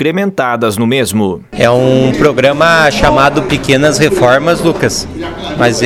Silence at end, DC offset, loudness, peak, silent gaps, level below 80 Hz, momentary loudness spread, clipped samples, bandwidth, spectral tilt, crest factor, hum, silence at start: 0 s; under 0.1%; -10 LUFS; 0 dBFS; none; -32 dBFS; 7 LU; 0.3%; 17 kHz; -5 dB/octave; 10 dB; none; 0 s